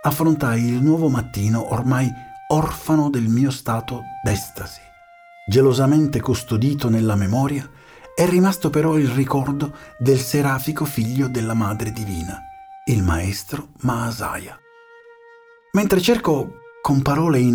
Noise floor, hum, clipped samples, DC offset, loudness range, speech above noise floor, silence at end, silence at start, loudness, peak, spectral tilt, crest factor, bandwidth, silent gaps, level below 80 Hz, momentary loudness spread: -48 dBFS; none; under 0.1%; under 0.1%; 5 LU; 29 dB; 0 s; 0 s; -20 LUFS; -4 dBFS; -6.5 dB/octave; 16 dB; over 20 kHz; none; -42 dBFS; 13 LU